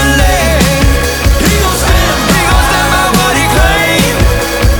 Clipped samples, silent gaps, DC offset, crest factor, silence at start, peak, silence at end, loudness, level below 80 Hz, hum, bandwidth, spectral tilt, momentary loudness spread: 0.3%; none; under 0.1%; 8 dB; 0 s; 0 dBFS; 0 s; -9 LUFS; -14 dBFS; none; over 20 kHz; -4 dB/octave; 2 LU